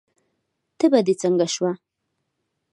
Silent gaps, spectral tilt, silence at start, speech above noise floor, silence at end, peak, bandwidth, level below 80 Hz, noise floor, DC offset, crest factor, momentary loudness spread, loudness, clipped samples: none; -5 dB/octave; 0.8 s; 58 dB; 0.95 s; -4 dBFS; 11.5 kHz; -76 dBFS; -77 dBFS; under 0.1%; 20 dB; 8 LU; -21 LUFS; under 0.1%